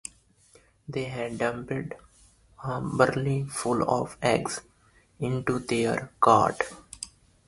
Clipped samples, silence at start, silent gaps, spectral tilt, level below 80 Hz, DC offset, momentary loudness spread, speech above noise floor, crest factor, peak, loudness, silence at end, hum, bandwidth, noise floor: under 0.1%; 0.9 s; none; -5.5 dB/octave; -56 dBFS; under 0.1%; 18 LU; 33 dB; 24 dB; -4 dBFS; -27 LUFS; 0.4 s; none; 11.5 kHz; -60 dBFS